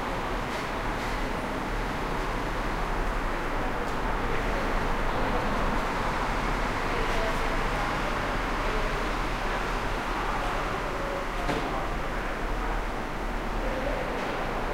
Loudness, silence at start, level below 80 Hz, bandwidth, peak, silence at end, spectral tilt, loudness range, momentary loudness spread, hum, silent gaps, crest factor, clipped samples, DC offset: -30 LUFS; 0 s; -32 dBFS; 16 kHz; -14 dBFS; 0 s; -5 dB/octave; 3 LU; 3 LU; none; none; 14 dB; under 0.1%; 0.2%